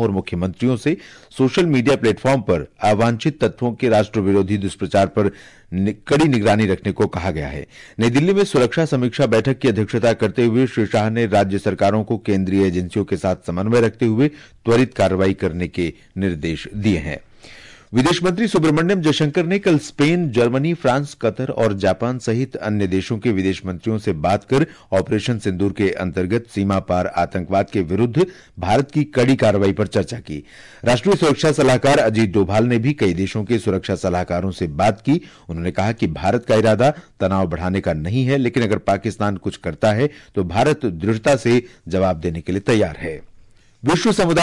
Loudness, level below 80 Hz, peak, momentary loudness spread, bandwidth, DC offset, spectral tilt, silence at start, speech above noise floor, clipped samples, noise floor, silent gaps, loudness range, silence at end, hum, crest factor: -19 LUFS; -46 dBFS; -6 dBFS; 7 LU; 11.5 kHz; 0.1%; -6.5 dB/octave; 0 s; 29 dB; under 0.1%; -47 dBFS; none; 3 LU; 0 s; none; 12 dB